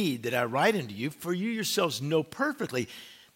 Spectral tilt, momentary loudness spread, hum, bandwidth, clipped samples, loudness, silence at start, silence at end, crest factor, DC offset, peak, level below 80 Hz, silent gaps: -4.5 dB/octave; 9 LU; none; 16.5 kHz; under 0.1%; -29 LUFS; 0 s; 0.2 s; 18 dB; under 0.1%; -10 dBFS; -74 dBFS; none